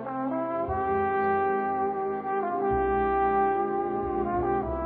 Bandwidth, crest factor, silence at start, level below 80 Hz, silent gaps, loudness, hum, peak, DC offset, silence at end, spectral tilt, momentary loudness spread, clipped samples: 4.1 kHz; 12 dB; 0 s; -46 dBFS; none; -27 LUFS; none; -14 dBFS; under 0.1%; 0 s; -11 dB/octave; 5 LU; under 0.1%